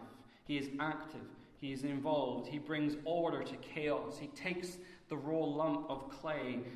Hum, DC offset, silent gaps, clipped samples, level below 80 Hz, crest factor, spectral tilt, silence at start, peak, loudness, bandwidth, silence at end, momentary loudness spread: none; under 0.1%; none; under 0.1%; -70 dBFS; 16 dB; -6 dB/octave; 0 s; -22 dBFS; -39 LUFS; 13.5 kHz; 0 s; 12 LU